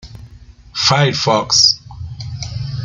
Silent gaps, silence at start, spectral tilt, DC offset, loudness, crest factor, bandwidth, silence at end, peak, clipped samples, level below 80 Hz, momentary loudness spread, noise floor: none; 0.05 s; -3 dB/octave; under 0.1%; -13 LUFS; 18 dB; 11 kHz; 0 s; 0 dBFS; under 0.1%; -42 dBFS; 18 LU; -40 dBFS